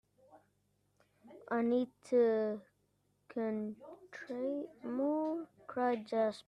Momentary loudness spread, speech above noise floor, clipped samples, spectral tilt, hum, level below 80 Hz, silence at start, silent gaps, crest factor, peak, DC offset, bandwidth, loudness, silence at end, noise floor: 15 LU; 42 dB; under 0.1%; -7 dB/octave; 50 Hz at -75 dBFS; -82 dBFS; 0.35 s; none; 16 dB; -20 dBFS; under 0.1%; 10.5 kHz; -36 LUFS; 0.05 s; -77 dBFS